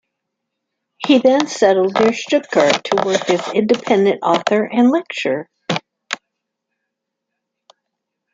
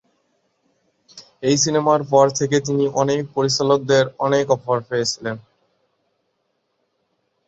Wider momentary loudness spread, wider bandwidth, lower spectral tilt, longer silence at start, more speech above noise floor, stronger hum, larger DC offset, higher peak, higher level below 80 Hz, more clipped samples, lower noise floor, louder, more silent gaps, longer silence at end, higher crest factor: first, 11 LU vs 7 LU; first, 9 kHz vs 8 kHz; about the same, -4.5 dB/octave vs -4.5 dB/octave; second, 1 s vs 1.15 s; first, 63 dB vs 53 dB; neither; neither; about the same, 0 dBFS vs -2 dBFS; about the same, -62 dBFS vs -60 dBFS; neither; first, -78 dBFS vs -71 dBFS; first, -16 LUFS vs -19 LUFS; neither; about the same, 2.2 s vs 2.1 s; about the same, 18 dB vs 20 dB